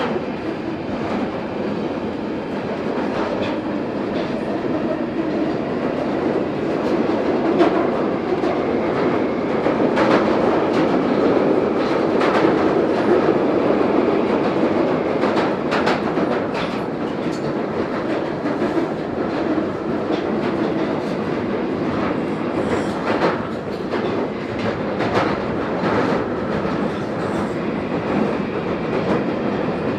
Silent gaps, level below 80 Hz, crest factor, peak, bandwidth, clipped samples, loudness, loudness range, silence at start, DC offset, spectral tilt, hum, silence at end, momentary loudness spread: none; -50 dBFS; 18 dB; -2 dBFS; 10 kHz; under 0.1%; -20 LUFS; 5 LU; 0 s; under 0.1%; -7 dB/octave; none; 0 s; 7 LU